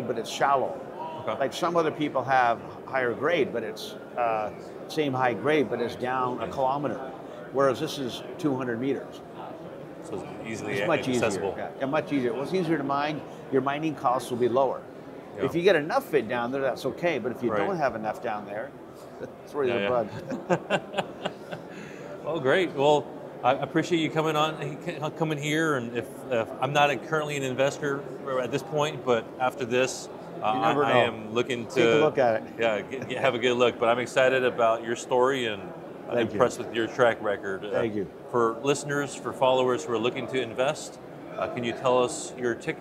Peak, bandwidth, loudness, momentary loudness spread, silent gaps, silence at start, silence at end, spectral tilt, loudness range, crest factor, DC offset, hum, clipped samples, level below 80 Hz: -6 dBFS; 16 kHz; -27 LUFS; 13 LU; none; 0 s; 0 s; -5 dB/octave; 5 LU; 22 dB; under 0.1%; none; under 0.1%; -66 dBFS